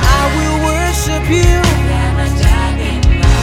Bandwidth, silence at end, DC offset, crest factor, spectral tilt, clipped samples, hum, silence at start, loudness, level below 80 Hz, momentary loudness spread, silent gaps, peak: 16 kHz; 0 s; under 0.1%; 12 dB; -5 dB/octave; under 0.1%; none; 0 s; -13 LUFS; -14 dBFS; 3 LU; none; 0 dBFS